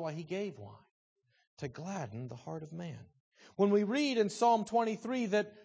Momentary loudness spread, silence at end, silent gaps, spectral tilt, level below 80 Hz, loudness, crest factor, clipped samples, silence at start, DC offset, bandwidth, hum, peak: 17 LU; 0.05 s; 0.91-1.16 s, 1.47-1.57 s, 3.20-3.32 s; -5.5 dB/octave; -76 dBFS; -33 LUFS; 18 dB; under 0.1%; 0 s; under 0.1%; 8 kHz; none; -16 dBFS